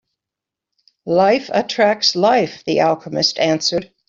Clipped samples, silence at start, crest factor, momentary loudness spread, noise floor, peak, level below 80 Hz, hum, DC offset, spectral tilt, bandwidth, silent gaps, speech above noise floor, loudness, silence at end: under 0.1%; 1.05 s; 16 dB; 6 LU; -85 dBFS; -2 dBFS; -60 dBFS; none; under 0.1%; -4 dB/octave; 7.6 kHz; none; 69 dB; -16 LUFS; 0.25 s